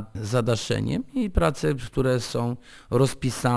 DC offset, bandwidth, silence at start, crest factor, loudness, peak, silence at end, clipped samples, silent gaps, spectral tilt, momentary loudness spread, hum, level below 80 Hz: under 0.1%; 11 kHz; 0 s; 18 dB; -25 LUFS; -6 dBFS; 0 s; under 0.1%; none; -6 dB/octave; 5 LU; none; -38 dBFS